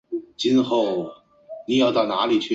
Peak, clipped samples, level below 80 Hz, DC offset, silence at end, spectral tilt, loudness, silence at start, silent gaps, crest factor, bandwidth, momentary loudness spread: -8 dBFS; under 0.1%; -64 dBFS; under 0.1%; 0 s; -5 dB/octave; -21 LUFS; 0.1 s; none; 14 dB; 7.8 kHz; 17 LU